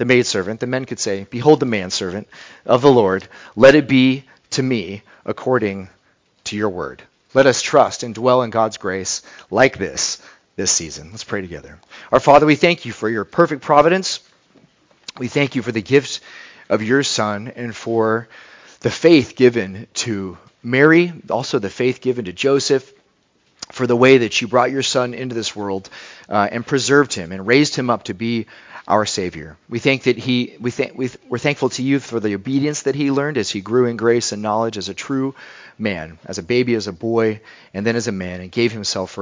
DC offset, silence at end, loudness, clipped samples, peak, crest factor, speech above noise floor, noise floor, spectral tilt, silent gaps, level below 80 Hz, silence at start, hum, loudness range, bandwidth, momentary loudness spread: under 0.1%; 0 s; -18 LUFS; under 0.1%; 0 dBFS; 18 dB; 43 dB; -61 dBFS; -4.5 dB/octave; none; -52 dBFS; 0 s; none; 5 LU; 7.8 kHz; 16 LU